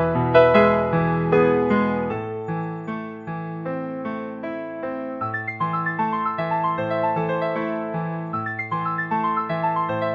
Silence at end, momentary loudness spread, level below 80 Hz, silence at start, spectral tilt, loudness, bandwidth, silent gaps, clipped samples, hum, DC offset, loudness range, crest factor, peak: 0 s; 12 LU; -54 dBFS; 0 s; -9 dB/octave; -23 LUFS; 5.8 kHz; none; under 0.1%; none; under 0.1%; 9 LU; 20 dB; -2 dBFS